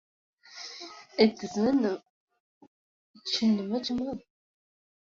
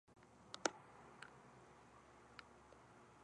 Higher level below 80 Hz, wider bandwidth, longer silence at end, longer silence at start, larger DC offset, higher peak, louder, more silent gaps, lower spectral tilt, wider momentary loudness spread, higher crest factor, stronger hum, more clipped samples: first, -66 dBFS vs -80 dBFS; second, 7.6 kHz vs 11 kHz; first, 0.95 s vs 0 s; first, 0.5 s vs 0.05 s; neither; first, -8 dBFS vs -20 dBFS; first, -28 LUFS vs -51 LUFS; first, 2.10-2.28 s, 2.40-2.61 s, 2.67-3.14 s vs none; first, -5 dB/octave vs -2 dB/octave; second, 17 LU vs 20 LU; second, 24 dB vs 36 dB; neither; neither